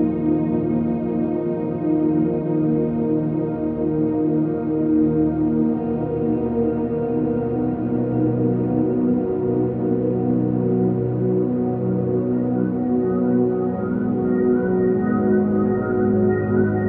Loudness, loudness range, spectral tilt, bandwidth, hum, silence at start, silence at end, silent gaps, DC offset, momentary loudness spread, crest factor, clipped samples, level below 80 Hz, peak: -21 LUFS; 2 LU; -14 dB/octave; 3.2 kHz; none; 0 s; 0 s; none; under 0.1%; 4 LU; 14 dB; under 0.1%; -46 dBFS; -6 dBFS